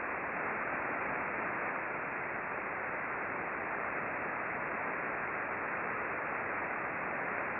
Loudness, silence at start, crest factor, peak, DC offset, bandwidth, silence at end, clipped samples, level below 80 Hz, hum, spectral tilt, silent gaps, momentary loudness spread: -36 LUFS; 0 s; 16 dB; -22 dBFS; under 0.1%; 4.6 kHz; 0 s; under 0.1%; -68 dBFS; none; -4.5 dB/octave; none; 2 LU